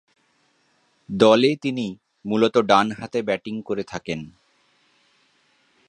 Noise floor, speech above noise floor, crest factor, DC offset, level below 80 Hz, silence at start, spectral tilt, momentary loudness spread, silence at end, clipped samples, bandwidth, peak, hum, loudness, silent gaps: -65 dBFS; 44 dB; 22 dB; under 0.1%; -62 dBFS; 1.1 s; -5.5 dB/octave; 16 LU; 1.6 s; under 0.1%; 9.8 kHz; -2 dBFS; none; -21 LUFS; none